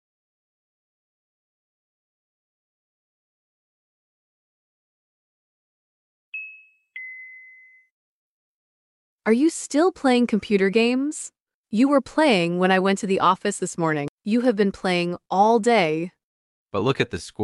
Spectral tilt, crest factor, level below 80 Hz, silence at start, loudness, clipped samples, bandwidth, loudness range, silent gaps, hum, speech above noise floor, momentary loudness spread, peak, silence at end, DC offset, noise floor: -5 dB/octave; 18 dB; -64 dBFS; 6.35 s; -21 LUFS; under 0.1%; 11.5 kHz; 20 LU; 7.91-9.19 s, 11.40-11.44 s, 11.54-11.64 s, 14.09-14.18 s, 16.24-16.67 s; none; 30 dB; 17 LU; -6 dBFS; 0 s; under 0.1%; -51 dBFS